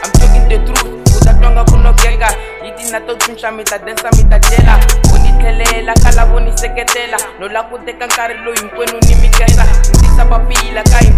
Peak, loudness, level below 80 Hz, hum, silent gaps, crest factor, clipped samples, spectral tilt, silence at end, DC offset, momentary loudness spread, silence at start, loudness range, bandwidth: 0 dBFS; -11 LUFS; -8 dBFS; none; none; 8 dB; 3%; -4.5 dB/octave; 0 s; under 0.1%; 9 LU; 0 s; 3 LU; 15.5 kHz